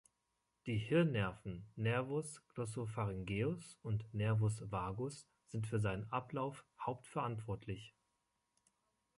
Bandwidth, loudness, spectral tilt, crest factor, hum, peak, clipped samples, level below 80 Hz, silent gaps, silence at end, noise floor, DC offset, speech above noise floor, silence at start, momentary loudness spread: 11.5 kHz; -41 LUFS; -6.5 dB/octave; 18 dB; none; -22 dBFS; under 0.1%; -64 dBFS; none; 1.3 s; -85 dBFS; under 0.1%; 46 dB; 0.65 s; 12 LU